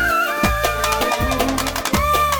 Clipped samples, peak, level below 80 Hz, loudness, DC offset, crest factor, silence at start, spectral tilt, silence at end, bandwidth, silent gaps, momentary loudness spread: under 0.1%; -2 dBFS; -28 dBFS; -18 LUFS; under 0.1%; 16 dB; 0 s; -3.5 dB/octave; 0 s; over 20 kHz; none; 2 LU